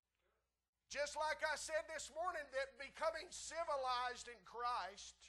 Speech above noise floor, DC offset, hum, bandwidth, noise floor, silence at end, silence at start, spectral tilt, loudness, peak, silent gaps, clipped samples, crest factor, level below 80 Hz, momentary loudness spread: 41 dB; under 0.1%; 60 Hz at -75 dBFS; 12.5 kHz; -86 dBFS; 0 s; 0.9 s; -0.5 dB/octave; -44 LUFS; -28 dBFS; none; under 0.1%; 18 dB; -74 dBFS; 8 LU